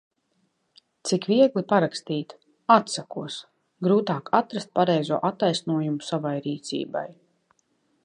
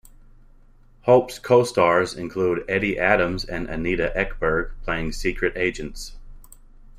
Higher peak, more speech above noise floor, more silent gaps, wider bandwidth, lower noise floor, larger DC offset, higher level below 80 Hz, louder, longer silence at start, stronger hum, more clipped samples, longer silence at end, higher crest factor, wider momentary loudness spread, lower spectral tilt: about the same, -4 dBFS vs -2 dBFS; first, 48 dB vs 29 dB; neither; second, 11 kHz vs 15.5 kHz; first, -71 dBFS vs -51 dBFS; neither; second, -74 dBFS vs -36 dBFS; second, -25 LUFS vs -22 LUFS; about the same, 1.05 s vs 1.05 s; neither; neither; first, 0.95 s vs 0 s; about the same, 22 dB vs 20 dB; first, 14 LU vs 10 LU; about the same, -5.5 dB/octave vs -5.5 dB/octave